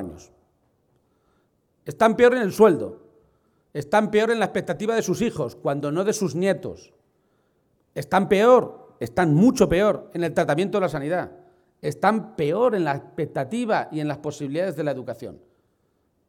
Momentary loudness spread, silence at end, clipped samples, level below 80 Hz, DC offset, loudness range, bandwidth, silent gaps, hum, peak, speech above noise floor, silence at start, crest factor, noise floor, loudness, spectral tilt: 17 LU; 0.95 s; under 0.1%; -54 dBFS; under 0.1%; 6 LU; 17 kHz; none; none; -4 dBFS; 47 dB; 0 s; 20 dB; -68 dBFS; -22 LUFS; -6 dB/octave